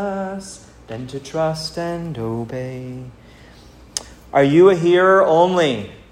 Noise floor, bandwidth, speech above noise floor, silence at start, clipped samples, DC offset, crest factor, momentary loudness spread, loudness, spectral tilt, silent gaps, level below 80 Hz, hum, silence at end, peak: -44 dBFS; 12 kHz; 26 dB; 0 s; under 0.1%; under 0.1%; 18 dB; 20 LU; -17 LUFS; -5.5 dB/octave; none; -50 dBFS; none; 0.15 s; 0 dBFS